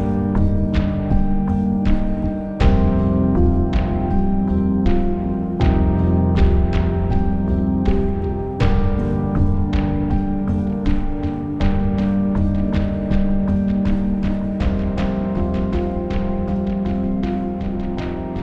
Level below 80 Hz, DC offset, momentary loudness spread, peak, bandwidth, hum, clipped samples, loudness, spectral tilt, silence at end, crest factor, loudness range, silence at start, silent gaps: -22 dBFS; under 0.1%; 5 LU; -4 dBFS; 6.2 kHz; none; under 0.1%; -20 LUFS; -9.5 dB/octave; 0 s; 14 dB; 3 LU; 0 s; none